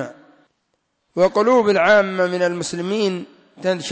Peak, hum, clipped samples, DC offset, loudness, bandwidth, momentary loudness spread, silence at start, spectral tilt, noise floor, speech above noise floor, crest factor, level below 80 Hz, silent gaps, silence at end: -6 dBFS; none; under 0.1%; under 0.1%; -18 LUFS; 8 kHz; 13 LU; 0 s; -4.5 dB/octave; -70 dBFS; 53 dB; 14 dB; -62 dBFS; none; 0 s